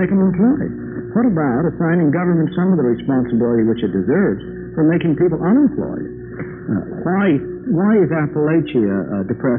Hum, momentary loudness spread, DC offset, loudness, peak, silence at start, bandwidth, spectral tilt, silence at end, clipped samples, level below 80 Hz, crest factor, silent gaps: none; 10 LU; under 0.1%; -17 LUFS; -4 dBFS; 0 s; 3.8 kHz; -8.5 dB/octave; 0 s; under 0.1%; -46 dBFS; 12 dB; none